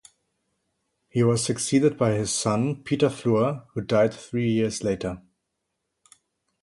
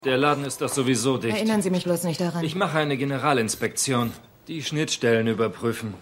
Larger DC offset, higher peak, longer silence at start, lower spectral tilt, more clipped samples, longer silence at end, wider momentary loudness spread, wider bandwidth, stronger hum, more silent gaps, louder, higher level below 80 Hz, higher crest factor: neither; about the same, -8 dBFS vs -6 dBFS; first, 1.15 s vs 0 s; about the same, -5.5 dB/octave vs -4.5 dB/octave; neither; first, 1.45 s vs 0 s; about the same, 8 LU vs 7 LU; second, 11.5 kHz vs 16 kHz; neither; neither; about the same, -24 LUFS vs -24 LUFS; first, -56 dBFS vs -62 dBFS; about the same, 18 dB vs 18 dB